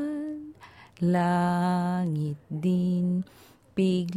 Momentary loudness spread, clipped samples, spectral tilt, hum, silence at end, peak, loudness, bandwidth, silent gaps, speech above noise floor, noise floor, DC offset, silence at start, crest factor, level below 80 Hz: 12 LU; under 0.1%; -8 dB/octave; none; 0 s; -14 dBFS; -27 LUFS; 11 kHz; none; 24 dB; -50 dBFS; under 0.1%; 0 s; 14 dB; -62 dBFS